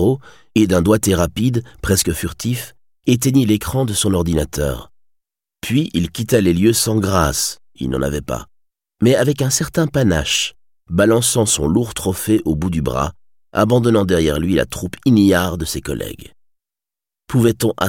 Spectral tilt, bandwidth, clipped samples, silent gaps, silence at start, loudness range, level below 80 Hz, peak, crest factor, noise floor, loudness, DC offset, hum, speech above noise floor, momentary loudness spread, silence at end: -5 dB/octave; 17 kHz; under 0.1%; none; 0 s; 2 LU; -36 dBFS; -2 dBFS; 16 dB; -89 dBFS; -17 LUFS; 0.4%; none; 72 dB; 10 LU; 0 s